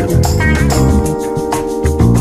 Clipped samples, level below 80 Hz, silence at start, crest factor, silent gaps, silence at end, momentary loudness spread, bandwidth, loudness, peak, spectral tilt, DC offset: under 0.1%; -18 dBFS; 0 s; 10 dB; none; 0 s; 5 LU; 16 kHz; -13 LUFS; 0 dBFS; -6.5 dB/octave; under 0.1%